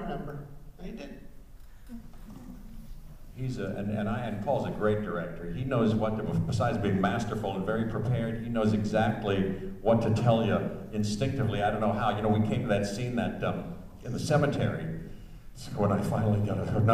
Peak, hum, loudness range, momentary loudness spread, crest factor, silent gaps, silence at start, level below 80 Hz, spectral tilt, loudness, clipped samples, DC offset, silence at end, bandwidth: -10 dBFS; none; 9 LU; 20 LU; 20 dB; none; 0 s; -46 dBFS; -7 dB/octave; -29 LUFS; under 0.1%; under 0.1%; 0 s; 14.5 kHz